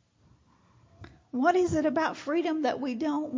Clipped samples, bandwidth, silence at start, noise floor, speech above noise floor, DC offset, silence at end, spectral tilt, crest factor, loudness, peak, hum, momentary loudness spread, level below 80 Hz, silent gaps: under 0.1%; 7.6 kHz; 1 s; -63 dBFS; 36 dB; under 0.1%; 0 s; -5.5 dB/octave; 18 dB; -28 LUFS; -12 dBFS; none; 6 LU; -58 dBFS; none